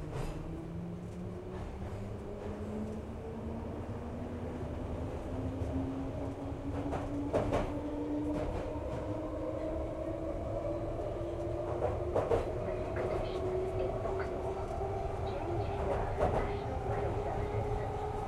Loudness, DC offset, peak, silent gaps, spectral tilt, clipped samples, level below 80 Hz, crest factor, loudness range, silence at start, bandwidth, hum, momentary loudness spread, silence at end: -37 LUFS; under 0.1%; -16 dBFS; none; -8 dB/octave; under 0.1%; -44 dBFS; 20 dB; 6 LU; 0 s; 12.5 kHz; none; 9 LU; 0 s